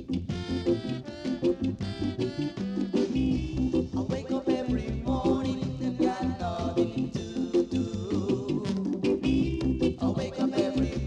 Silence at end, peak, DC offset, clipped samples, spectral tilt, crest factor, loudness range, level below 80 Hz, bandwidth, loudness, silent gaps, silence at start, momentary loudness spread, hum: 0 s; -14 dBFS; under 0.1%; under 0.1%; -7.5 dB/octave; 16 dB; 1 LU; -42 dBFS; 9.4 kHz; -29 LUFS; none; 0 s; 5 LU; none